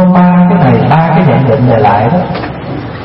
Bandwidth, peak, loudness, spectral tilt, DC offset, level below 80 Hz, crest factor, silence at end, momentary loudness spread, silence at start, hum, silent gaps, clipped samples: 5.6 kHz; 0 dBFS; -8 LUFS; -11 dB/octave; under 0.1%; -34 dBFS; 8 dB; 0 s; 12 LU; 0 s; none; none; 0.3%